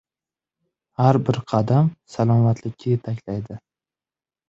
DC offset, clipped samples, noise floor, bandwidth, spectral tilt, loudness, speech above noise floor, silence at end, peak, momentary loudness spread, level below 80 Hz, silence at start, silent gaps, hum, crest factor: under 0.1%; under 0.1%; under -90 dBFS; 7.6 kHz; -9 dB/octave; -21 LUFS; over 70 dB; 0.9 s; -2 dBFS; 13 LU; -54 dBFS; 1 s; none; none; 20 dB